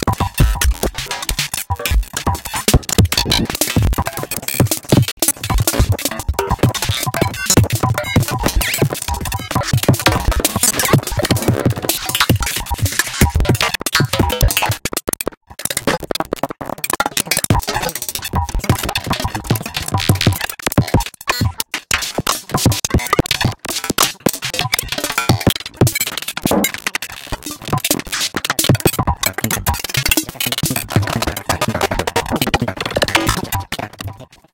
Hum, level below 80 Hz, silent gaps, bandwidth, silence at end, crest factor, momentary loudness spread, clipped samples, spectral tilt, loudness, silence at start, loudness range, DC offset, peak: none; -26 dBFS; 5.12-5.17 s, 15.37-15.41 s; 17.5 kHz; 0.3 s; 18 dB; 7 LU; under 0.1%; -3.5 dB/octave; -17 LUFS; 0 s; 3 LU; under 0.1%; 0 dBFS